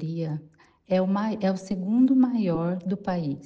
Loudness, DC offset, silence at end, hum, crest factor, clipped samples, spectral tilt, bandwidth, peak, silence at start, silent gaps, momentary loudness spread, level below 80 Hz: -25 LUFS; under 0.1%; 0 s; none; 14 dB; under 0.1%; -8.5 dB/octave; 7.8 kHz; -10 dBFS; 0 s; none; 10 LU; -60 dBFS